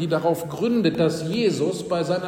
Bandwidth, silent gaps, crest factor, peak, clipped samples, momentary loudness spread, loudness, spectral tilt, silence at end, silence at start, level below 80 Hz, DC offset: 16.5 kHz; none; 16 dB; -6 dBFS; under 0.1%; 4 LU; -23 LUFS; -6 dB/octave; 0 s; 0 s; -58 dBFS; under 0.1%